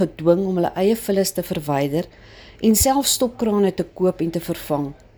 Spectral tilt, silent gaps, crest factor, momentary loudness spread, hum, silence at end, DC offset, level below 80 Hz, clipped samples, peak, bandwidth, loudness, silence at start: -4.5 dB/octave; none; 16 dB; 9 LU; none; 0.25 s; under 0.1%; -42 dBFS; under 0.1%; -4 dBFS; over 20 kHz; -20 LUFS; 0 s